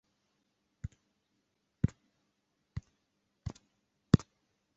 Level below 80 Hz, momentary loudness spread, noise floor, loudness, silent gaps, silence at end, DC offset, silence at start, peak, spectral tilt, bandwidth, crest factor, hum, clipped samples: -52 dBFS; 19 LU; -80 dBFS; -32 LUFS; none; 0.6 s; under 0.1%; 1.85 s; -8 dBFS; -8 dB/octave; 8 kHz; 32 dB; none; under 0.1%